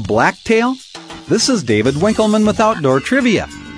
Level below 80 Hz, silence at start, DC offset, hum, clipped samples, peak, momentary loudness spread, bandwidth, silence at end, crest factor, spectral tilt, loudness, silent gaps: -42 dBFS; 0 s; under 0.1%; none; under 0.1%; 0 dBFS; 6 LU; 11 kHz; 0 s; 14 dB; -4.5 dB/octave; -14 LUFS; none